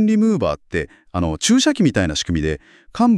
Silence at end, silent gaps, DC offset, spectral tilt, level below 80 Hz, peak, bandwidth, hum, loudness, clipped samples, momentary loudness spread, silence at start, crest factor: 0 s; none; under 0.1%; -5 dB/octave; -40 dBFS; -4 dBFS; 12 kHz; none; -19 LUFS; under 0.1%; 11 LU; 0 s; 14 dB